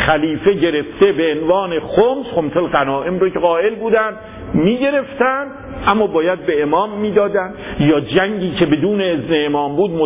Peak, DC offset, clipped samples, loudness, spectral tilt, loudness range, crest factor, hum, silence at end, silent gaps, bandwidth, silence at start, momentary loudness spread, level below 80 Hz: -2 dBFS; under 0.1%; under 0.1%; -16 LUFS; -10 dB/octave; 1 LU; 14 dB; none; 0 s; none; 3.9 kHz; 0 s; 4 LU; -42 dBFS